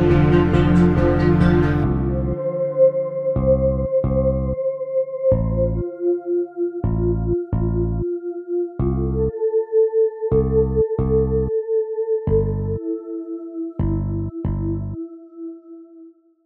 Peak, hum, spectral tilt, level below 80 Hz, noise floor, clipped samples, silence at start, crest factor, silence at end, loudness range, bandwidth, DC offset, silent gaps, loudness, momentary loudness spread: -4 dBFS; none; -10.5 dB/octave; -30 dBFS; -46 dBFS; under 0.1%; 0 s; 16 dB; 0.35 s; 6 LU; 5.8 kHz; under 0.1%; none; -20 LUFS; 11 LU